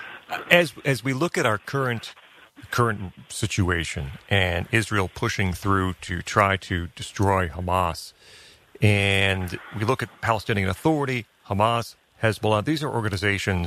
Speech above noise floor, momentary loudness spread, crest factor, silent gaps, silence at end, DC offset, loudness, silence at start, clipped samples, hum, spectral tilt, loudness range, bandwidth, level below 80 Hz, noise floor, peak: 24 dB; 11 LU; 24 dB; none; 0 s; under 0.1%; -24 LUFS; 0 s; under 0.1%; none; -5 dB/octave; 2 LU; 14 kHz; -46 dBFS; -48 dBFS; 0 dBFS